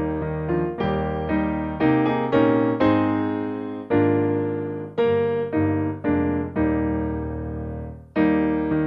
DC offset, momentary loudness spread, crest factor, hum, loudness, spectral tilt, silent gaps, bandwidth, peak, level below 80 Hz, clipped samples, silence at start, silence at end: under 0.1%; 9 LU; 16 dB; none; -23 LUFS; -10 dB/octave; none; 5.2 kHz; -6 dBFS; -40 dBFS; under 0.1%; 0 s; 0 s